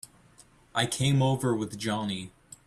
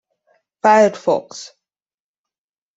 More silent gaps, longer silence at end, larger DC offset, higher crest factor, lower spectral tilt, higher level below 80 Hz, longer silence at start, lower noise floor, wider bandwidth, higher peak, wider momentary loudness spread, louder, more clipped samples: neither; second, 0.4 s vs 1.3 s; neither; about the same, 20 dB vs 18 dB; about the same, -5 dB/octave vs -4.5 dB/octave; first, -60 dBFS vs -66 dBFS; about the same, 0.75 s vs 0.65 s; second, -58 dBFS vs under -90 dBFS; first, 13.5 kHz vs 8 kHz; second, -10 dBFS vs -2 dBFS; second, 14 LU vs 21 LU; second, -28 LUFS vs -15 LUFS; neither